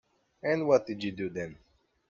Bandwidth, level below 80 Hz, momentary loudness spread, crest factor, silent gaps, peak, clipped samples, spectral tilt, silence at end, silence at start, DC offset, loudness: 7.4 kHz; -68 dBFS; 13 LU; 22 dB; none; -10 dBFS; under 0.1%; -6.5 dB/octave; 0.55 s; 0.45 s; under 0.1%; -30 LUFS